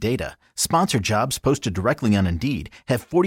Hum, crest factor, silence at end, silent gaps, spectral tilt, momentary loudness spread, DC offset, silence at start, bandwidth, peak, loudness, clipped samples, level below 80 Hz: none; 16 dB; 0 s; none; -5 dB/octave; 7 LU; under 0.1%; 0 s; 17 kHz; -6 dBFS; -22 LUFS; under 0.1%; -42 dBFS